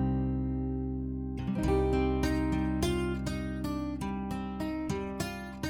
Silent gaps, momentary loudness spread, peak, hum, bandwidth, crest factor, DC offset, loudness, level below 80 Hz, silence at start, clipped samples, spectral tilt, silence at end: none; 7 LU; -18 dBFS; none; 18 kHz; 14 dB; under 0.1%; -32 LUFS; -38 dBFS; 0 s; under 0.1%; -7 dB/octave; 0 s